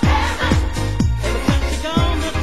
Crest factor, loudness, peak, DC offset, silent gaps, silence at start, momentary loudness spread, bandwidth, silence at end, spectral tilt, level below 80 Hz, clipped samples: 16 dB; -19 LUFS; -2 dBFS; 3%; none; 0 s; 2 LU; 12.5 kHz; 0 s; -5.5 dB/octave; -22 dBFS; under 0.1%